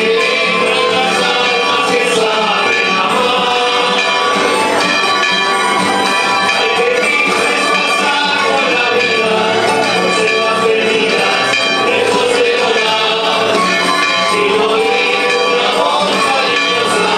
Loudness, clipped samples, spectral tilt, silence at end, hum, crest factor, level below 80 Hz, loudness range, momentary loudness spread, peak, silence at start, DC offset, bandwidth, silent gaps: -11 LUFS; under 0.1%; -2.5 dB/octave; 0 s; none; 12 dB; -56 dBFS; 0 LU; 1 LU; 0 dBFS; 0 s; under 0.1%; 14 kHz; none